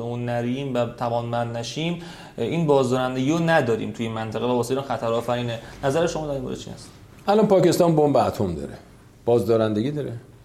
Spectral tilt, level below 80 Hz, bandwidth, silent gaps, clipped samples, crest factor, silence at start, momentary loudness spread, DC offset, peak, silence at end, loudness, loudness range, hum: -6.5 dB/octave; -52 dBFS; 15.5 kHz; none; under 0.1%; 18 dB; 0 s; 13 LU; under 0.1%; -6 dBFS; 0.15 s; -23 LUFS; 4 LU; none